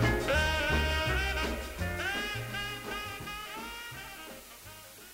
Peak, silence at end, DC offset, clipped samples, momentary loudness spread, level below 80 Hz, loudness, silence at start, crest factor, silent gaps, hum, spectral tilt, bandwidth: -14 dBFS; 0 s; under 0.1%; under 0.1%; 18 LU; -40 dBFS; -32 LUFS; 0 s; 18 dB; none; none; -4 dB/octave; 16 kHz